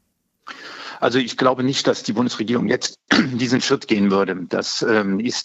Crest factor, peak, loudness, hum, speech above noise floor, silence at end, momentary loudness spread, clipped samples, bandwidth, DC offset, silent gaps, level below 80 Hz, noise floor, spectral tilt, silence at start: 18 dB; -2 dBFS; -19 LUFS; none; 27 dB; 0 s; 8 LU; under 0.1%; 8.2 kHz; under 0.1%; none; -68 dBFS; -46 dBFS; -4.5 dB/octave; 0.45 s